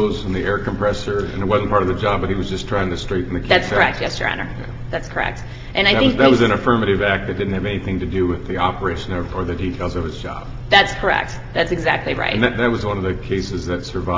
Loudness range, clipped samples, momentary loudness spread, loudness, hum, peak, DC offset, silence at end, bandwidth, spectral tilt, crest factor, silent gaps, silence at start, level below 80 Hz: 3 LU; under 0.1%; 11 LU; -19 LUFS; none; 0 dBFS; under 0.1%; 0 s; 7.8 kHz; -6 dB/octave; 18 dB; none; 0 s; -32 dBFS